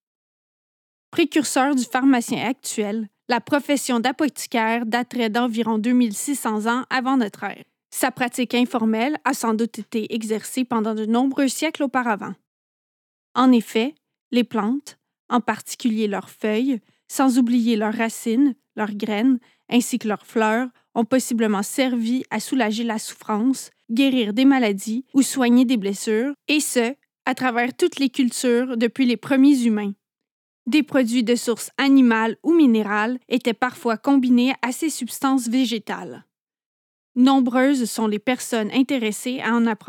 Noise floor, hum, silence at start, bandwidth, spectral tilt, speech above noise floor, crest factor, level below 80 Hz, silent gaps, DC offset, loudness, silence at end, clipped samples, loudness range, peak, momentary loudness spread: under -90 dBFS; none; 1.15 s; 17.5 kHz; -4 dB/octave; over 70 dB; 18 dB; -84 dBFS; 12.47-13.35 s, 14.21-14.31 s, 15.19-15.29 s, 30.31-30.66 s, 36.41-36.47 s, 36.66-37.15 s; under 0.1%; -21 LUFS; 0.1 s; under 0.1%; 4 LU; -4 dBFS; 9 LU